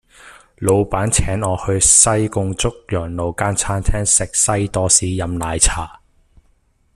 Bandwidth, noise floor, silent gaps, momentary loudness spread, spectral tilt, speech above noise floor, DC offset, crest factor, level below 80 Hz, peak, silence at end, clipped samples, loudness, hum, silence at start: 15 kHz; -58 dBFS; none; 12 LU; -3.5 dB/octave; 41 dB; under 0.1%; 18 dB; -30 dBFS; 0 dBFS; 1.05 s; under 0.1%; -16 LUFS; none; 0.25 s